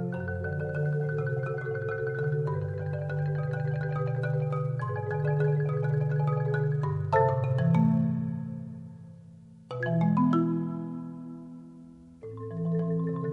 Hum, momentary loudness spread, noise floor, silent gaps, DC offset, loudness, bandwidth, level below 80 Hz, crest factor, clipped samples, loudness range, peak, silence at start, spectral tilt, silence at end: none; 17 LU; -50 dBFS; none; under 0.1%; -29 LUFS; 4.7 kHz; -62 dBFS; 18 dB; under 0.1%; 4 LU; -10 dBFS; 0 s; -10.5 dB/octave; 0 s